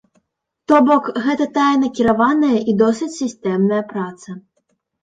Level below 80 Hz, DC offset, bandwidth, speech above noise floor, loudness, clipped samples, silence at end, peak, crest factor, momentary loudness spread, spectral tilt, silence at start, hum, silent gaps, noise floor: -54 dBFS; under 0.1%; 9.2 kHz; 54 dB; -16 LUFS; under 0.1%; 0.65 s; 0 dBFS; 16 dB; 14 LU; -6 dB/octave; 0.7 s; none; none; -70 dBFS